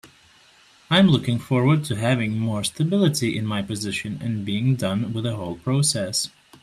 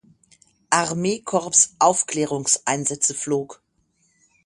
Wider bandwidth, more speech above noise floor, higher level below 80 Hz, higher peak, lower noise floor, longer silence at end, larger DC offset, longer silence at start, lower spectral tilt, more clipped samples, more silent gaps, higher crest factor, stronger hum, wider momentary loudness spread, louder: first, 14 kHz vs 11.5 kHz; second, 32 dB vs 45 dB; first, -56 dBFS vs -64 dBFS; second, -4 dBFS vs 0 dBFS; second, -54 dBFS vs -66 dBFS; second, 0.35 s vs 0.9 s; neither; second, 0.05 s vs 0.7 s; first, -5 dB/octave vs -2.5 dB/octave; neither; neither; about the same, 18 dB vs 22 dB; neither; about the same, 9 LU vs 9 LU; about the same, -22 LUFS vs -20 LUFS